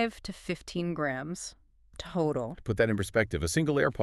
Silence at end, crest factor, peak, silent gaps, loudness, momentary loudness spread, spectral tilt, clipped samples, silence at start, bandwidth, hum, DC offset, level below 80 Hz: 0 s; 20 dB; -10 dBFS; none; -31 LUFS; 13 LU; -5.5 dB/octave; under 0.1%; 0 s; 13.5 kHz; none; under 0.1%; -50 dBFS